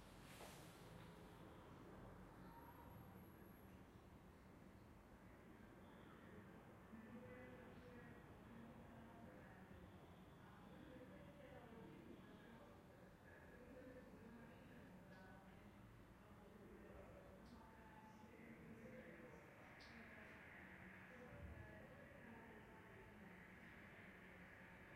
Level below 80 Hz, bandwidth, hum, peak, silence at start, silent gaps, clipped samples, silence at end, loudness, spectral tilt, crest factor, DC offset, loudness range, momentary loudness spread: -74 dBFS; 15.5 kHz; none; -46 dBFS; 0 s; none; under 0.1%; 0 s; -63 LUFS; -6 dB/octave; 16 dB; under 0.1%; 3 LU; 5 LU